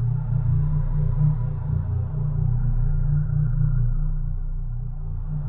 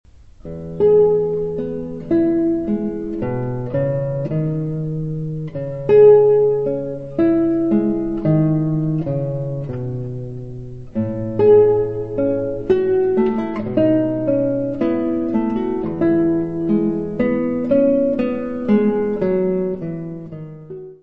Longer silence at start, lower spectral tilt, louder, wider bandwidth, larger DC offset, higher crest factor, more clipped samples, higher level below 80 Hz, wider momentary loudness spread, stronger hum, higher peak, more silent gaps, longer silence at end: about the same, 0 s vs 0.05 s; first, -13.5 dB/octave vs -11 dB/octave; second, -25 LUFS vs -18 LUFS; second, 1.8 kHz vs 4.5 kHz; second, under 0.1% vs 1%; about the same, 12 dB vs 16 dB; neither; first, -26 dBFS vs -44 dBFS; second, 10 LU vs 13 LU; first, 60 Hz at -40 dBFS vs none; second, -10 dBFS vs -2 dBFS; neither; about the same, 0 s vs 0 s